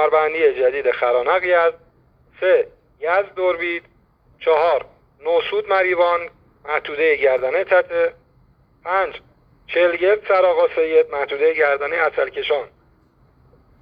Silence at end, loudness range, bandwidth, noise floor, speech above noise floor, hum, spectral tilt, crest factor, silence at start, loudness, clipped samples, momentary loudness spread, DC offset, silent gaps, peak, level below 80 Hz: 1.15 s; 3 LU; 5.2 kHz; -56 dBFS; 38 dB; none; -6 dB/octave; 16 dB; 0 s; -19 LUFS; under 0.1%; 9 LU; under 0.1%; none; -4 dBFS; -58 dBFS